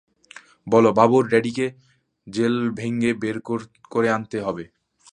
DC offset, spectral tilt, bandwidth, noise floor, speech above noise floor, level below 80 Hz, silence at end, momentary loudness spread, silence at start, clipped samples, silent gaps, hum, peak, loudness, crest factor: under 0.1%; -6.5 dB/octave; 10 kHz; -48 dBFS; 27 dB; -62 dBFS; 0.5 s; 13 LU; 0.65 s; under 0.1%; none; none; -2 dBFS; -21 LUFS; 20 dB